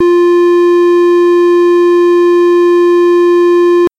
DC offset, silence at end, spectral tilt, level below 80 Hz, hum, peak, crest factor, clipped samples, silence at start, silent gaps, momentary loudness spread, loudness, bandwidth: under 0.1%; 0.1 s; -5 dB/octave; -54 dBFS; none; -4 dBFS; 2 dB; under 0.1%; 0 s; none; 0 LU; -8 LUFS; 7.8 kHz